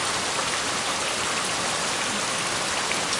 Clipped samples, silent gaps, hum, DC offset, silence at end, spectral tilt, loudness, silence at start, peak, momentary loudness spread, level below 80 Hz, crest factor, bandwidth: under 0.1%; none; none; under 0.1%; 0 s; -1 dB/octave; -24 LUFS; 0 s; -12 dBFS; 0 LU; -56 dBFS; 14 dB; 11.5 kHz